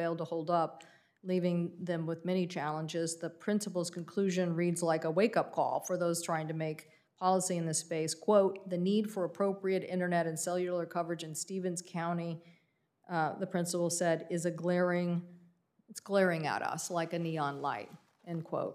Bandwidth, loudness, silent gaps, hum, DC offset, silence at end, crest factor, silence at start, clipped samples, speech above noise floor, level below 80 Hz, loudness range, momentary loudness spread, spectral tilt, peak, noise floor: 15.5 kHz; -34 LUFS; none; none; under 0.1%; 0 s; 20 dB; 0 s; under 0.1%; 41 dB; -88 dBFS; 3 LU; 8 LU; -5 dB/octave; -14 dBFS; -74 dBFS